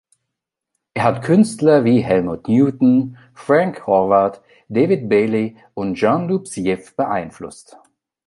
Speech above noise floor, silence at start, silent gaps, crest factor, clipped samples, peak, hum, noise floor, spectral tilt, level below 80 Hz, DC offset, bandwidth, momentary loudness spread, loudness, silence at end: 64 dB; 0.95 s; none; 16 dB; under 0.1%; -2 dBFS; none; -81 dBFS; -7 dB/octave; -54 dBFS; under 0.1%; 11.5 kHz; 12 LU; -17 LUFS; 0.75 s